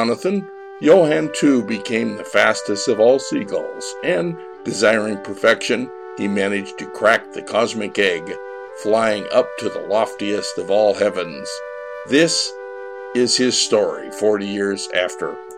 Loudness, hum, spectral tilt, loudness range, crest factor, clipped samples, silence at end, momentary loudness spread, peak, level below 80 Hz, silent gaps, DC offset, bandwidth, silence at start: -19 LUFS; none; -3.5 dB/octave; 3 LU; 16 dB; under 0.1%; 0 s; 13 LU; -2 dBFS; -64 dBFS; none; 0.1%; 14 kHz; 0 s